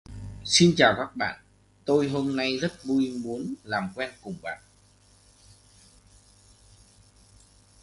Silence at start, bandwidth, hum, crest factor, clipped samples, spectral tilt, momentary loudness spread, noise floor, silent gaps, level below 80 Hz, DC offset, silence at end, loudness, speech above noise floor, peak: 0.1 s; 11.5 kHz; 50 Hz at -60 dBFS; 26 dB; under 0.1%; -4 dB/octave; 19 LU; -59 dBFS; none; -56 dBFS; under 0.1%; 3.25 s; -25 LUFS; 33 dB; -2 dBFS